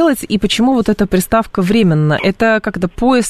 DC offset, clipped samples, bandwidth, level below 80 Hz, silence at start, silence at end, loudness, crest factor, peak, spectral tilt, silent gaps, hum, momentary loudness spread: under 0.1%; under 0.1%; 13.5 kHz; -34 dBFS; 0 s; 0 s; -14 LUFS; 12 dB; -2 dBFS; -5.5 dB/octave; none; none; 4 LU